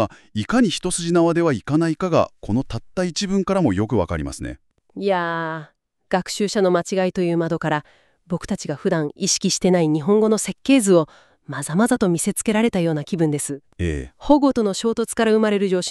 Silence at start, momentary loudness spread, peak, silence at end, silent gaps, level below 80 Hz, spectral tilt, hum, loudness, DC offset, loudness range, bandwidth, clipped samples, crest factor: 0 s; 10 LU; -2 dBFS; 0 s; none; -44 dBFS; -5 dB/octave; none; -20 LUFS; under 0.1%; 4 LU; 13.5 kHz; under 0.1%; 18 dB